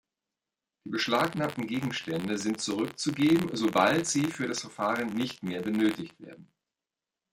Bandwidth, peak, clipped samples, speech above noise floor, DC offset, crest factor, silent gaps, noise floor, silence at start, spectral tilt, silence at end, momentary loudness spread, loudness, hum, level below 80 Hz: 16.5 kHz; -10 dBFS; under 0.1%; over 61 dB; under 0.1%; 20 dB; none; under -90 dBFS; 0.85 s; -4.5 dB/octave; 0.9 s; 8 LU; -29 LUFS; none; -68 dBFS